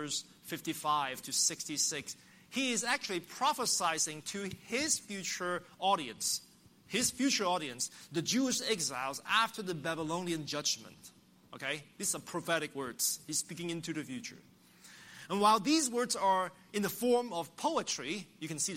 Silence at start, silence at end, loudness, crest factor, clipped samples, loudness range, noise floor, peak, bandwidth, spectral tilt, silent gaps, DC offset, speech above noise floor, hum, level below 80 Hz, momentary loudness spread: 0 s; 0 s; -33 LUFS; 20 dB; under 0.1%; 4 LU; -58 dBFS; -14 dBFS; 16 kHz; -2 dB/octave; none; under 0.1%; 24 dB; none; -76 dBFS; 10 LU